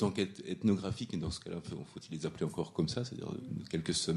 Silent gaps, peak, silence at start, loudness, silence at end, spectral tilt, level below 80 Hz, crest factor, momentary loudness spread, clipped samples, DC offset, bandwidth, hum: none; -18 dBFS; 0 s; -37 LUFS; 0 s; -5.5 dB/octave; -62 dBFS; 18 dB; 10 LU; under 0.1%; under 0.1%; 12 kHz; none